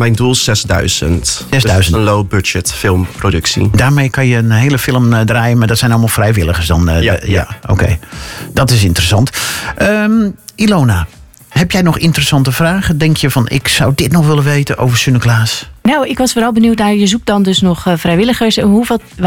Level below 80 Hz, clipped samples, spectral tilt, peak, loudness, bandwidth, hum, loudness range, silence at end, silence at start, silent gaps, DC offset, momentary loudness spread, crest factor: -28 dBFS; under 0.1%; -5 dB/octave; 0 dBFS; -11 LUFS; 17.5 kHz; none; 2 LU; 0 s; 0 s; none; under 0.1%; 5 LU; 10 dB